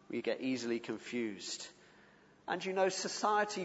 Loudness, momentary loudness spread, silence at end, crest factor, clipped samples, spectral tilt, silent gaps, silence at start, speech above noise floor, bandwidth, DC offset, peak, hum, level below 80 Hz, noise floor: -37 LUFS; 10 LU; 0 s; 20 dB; under 0.1%; -3 dB/octave; none; 0.1 s; 27 dB; 8 kHz; under 0.1%; -18 dBFS; none; -82 dBFS; -63 dBFS